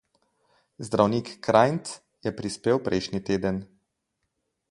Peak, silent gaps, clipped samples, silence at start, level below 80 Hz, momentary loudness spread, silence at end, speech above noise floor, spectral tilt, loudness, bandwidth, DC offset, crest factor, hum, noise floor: -2 dBFS; none; under 0.1%; 0.8 s; -56 dBFS; 13 LU; 1.05 s; 54 dB; -6 dB/octave; -26 LUFS; 11.5 kHz; under 0.1%; 24 dB; none; -79 dBFS